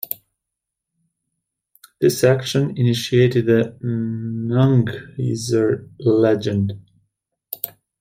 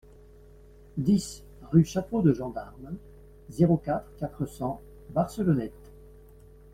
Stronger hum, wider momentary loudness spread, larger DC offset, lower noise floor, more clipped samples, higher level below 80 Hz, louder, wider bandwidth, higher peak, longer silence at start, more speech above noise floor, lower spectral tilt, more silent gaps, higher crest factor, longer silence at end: neither; second, 13 LU vs 18 LU; neither; first, -83 dBFS vs -52 dBFS; neither; second, -58 dBFS vs -50 dBFS; first, -19 LUFS vs -27 LUFS; about the same, 16.5 kHz vs 15 kHz; first, -2 dBFS vs -8 dBFS; second, 0.1 s vs 0.95 s; first, 65 dB vs 25 dB; second, -6.5 dB/octave vs -8 dB/octave; neither; about the same, 18 dB vs 20 dB; second, 0.35 s vs 1.05 s